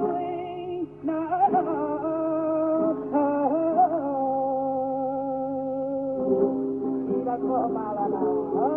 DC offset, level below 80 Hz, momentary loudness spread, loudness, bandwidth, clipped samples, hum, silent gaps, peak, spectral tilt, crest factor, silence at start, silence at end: under 0.1%; -62 dBFS; 7 LU; -26 LUFS; 3.3 kHz; under 0.1%; none; none; -10 dBFS; -10.5 dB/octave; 14 dB; 0 s; 0 s